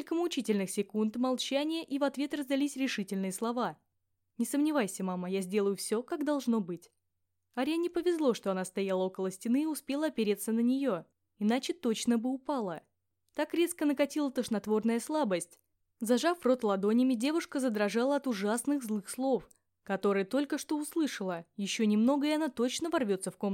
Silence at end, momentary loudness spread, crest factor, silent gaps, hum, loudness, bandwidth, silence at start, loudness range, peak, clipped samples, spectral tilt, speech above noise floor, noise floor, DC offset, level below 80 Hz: 0 s; 7 LU; 16 dB; none; none; -32 LUFS; 16.5 kHz; 0 s; 3 LU; -14 dBFS; under 0.1%; -4.5 dB/octave; 53 dB; -84 dBFS; under 0.1%; -76 dBFS